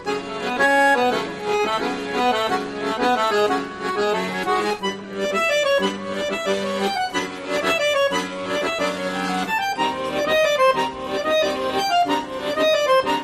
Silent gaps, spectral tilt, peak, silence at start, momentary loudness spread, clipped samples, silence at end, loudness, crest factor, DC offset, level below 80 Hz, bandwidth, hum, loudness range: none; -3.5 dB/octave; -6 dBFS; 0 s; 8 LU; under 0.1%; 0 s; -21 LUFS; 16 dB; under 0.1%; -56 dBFS; 15 kHz; none; 2 LU